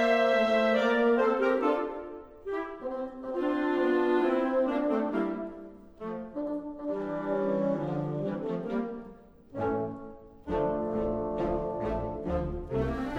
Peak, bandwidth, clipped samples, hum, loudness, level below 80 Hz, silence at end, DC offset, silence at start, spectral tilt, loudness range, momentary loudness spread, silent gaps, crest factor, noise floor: -12 dBFS; 9.2 kHz; under 0.1%; none; -30 LUFS; -48 dBFS; 0 s; under 0.1%; 0 s; -7.5 dB/octave; 5 LU; 15 LU; none; 16 dB; -50 dBFS